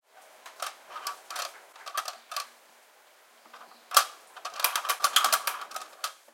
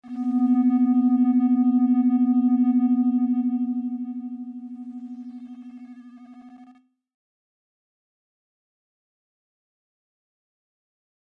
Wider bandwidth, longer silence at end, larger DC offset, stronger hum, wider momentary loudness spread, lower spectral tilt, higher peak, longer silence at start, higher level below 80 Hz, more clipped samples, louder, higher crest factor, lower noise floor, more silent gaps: first, 17 kHz vs 2.8 kHz; second, 0.2 s vs 4.6 s; neither; neither; about the same, 20 LU vs 19 LU; second, 4 dB/octave vs -9.5 dB/octave; first, -2 dBFS vs -12 dBFS; about the same, 0.15 s vs 0.05 s; second, under -90 dBFS vs -84 dBFS; neither; second, -29 LUFS vs -21 LUFS; first, 32 dB vs 12 dB; about the same, -58 dBFS vs -55 dBFS; neither